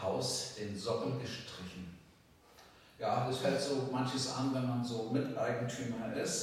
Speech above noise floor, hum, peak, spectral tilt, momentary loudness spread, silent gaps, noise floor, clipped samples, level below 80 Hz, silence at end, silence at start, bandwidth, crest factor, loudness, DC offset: 27 dB; none; -20 dBFS; -4.5 dB/octave; 10 LU; none; -63 dBFS; under 0.1%; -72 dBFS; 0 s; 0 s; 15.5 kHz; 16 dB; -37 LUFS; under 0.1%